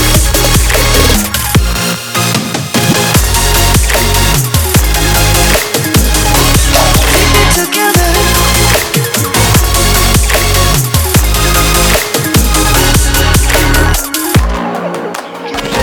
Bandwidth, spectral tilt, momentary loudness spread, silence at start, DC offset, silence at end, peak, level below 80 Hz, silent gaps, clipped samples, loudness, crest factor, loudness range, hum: over 20 kHz; -3.5 dB/octave; 5 LU; 0 s; under 0.1%; 0 s; 0 dBFS; -14 dBFS; none; under 0.1%; -9 LUFS; 8 dB; 2 LU; none